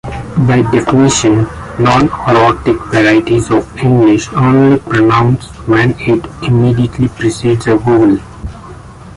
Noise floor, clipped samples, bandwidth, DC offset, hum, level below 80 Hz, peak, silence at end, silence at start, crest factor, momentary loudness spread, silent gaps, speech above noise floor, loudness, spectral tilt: -31 dBFS; under 0.1%; 11.5 kHz; under 0.1%; none; -32 dBFS; 0 dBFS; 0 s; 0.05 s; 10 dB; 6 LU; none; 21 dB; -11 LUFS; -6.5 dB/octave